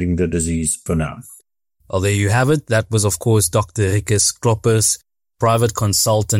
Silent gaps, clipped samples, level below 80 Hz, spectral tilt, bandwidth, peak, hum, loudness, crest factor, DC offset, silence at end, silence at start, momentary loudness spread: none; under 0.1%; -42 dBFS; -4.5 dB/octave; 16.5 kHz; -6 dBFS; none; -17 LUFS; 12 dB; under 0.1%; 0 s; 0 s; 6 LU